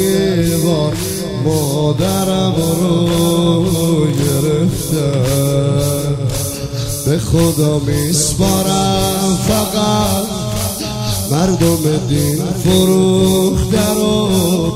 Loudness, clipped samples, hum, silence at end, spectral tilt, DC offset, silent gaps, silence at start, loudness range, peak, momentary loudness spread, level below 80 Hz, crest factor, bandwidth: -14 LUFS; under 0.1%; none; 0 s; -5.5 dB/octave; under 0.1%; none; 0 s; 2 LU; 0 dBFS; 6 LU; -32 dBFS; 14 dB; 16 kHz